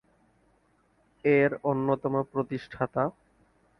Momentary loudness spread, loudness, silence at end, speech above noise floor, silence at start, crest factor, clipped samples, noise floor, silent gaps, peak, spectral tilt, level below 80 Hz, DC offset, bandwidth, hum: 9 LU; -28 LUFS; 0.7 s; 40 dB; 1.25 s; 20 dB; under 0.1%; -67 dBFS; none; -10 dBFS; -9.5 dB/octave; -64 dBFS; under 0.1%; 6 kHz; none